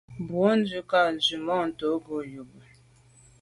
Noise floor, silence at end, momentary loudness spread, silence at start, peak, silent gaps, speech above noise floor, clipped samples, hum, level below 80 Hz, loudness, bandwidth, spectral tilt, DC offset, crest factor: -57 dBFS; 0.8 s; 12 LU; 0.1 s; -10 dBFS; none; 31 dB; under 0.1%; none; -64 dBFS; -26 LUFS; 11.5 kHz; -5 dB/octave; under 0.1%; 18 dB